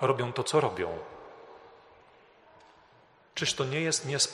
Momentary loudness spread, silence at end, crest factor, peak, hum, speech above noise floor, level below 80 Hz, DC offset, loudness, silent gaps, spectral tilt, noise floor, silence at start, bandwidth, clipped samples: 22 LU; 0 s; 22 dB; -10 dBFS; none; 31 dB; -68 dBFS; under 0.1%; -30 LUFS; none; -3 dB/octave; -61 dBFS; 0 s; 13 kHz; under 0.1%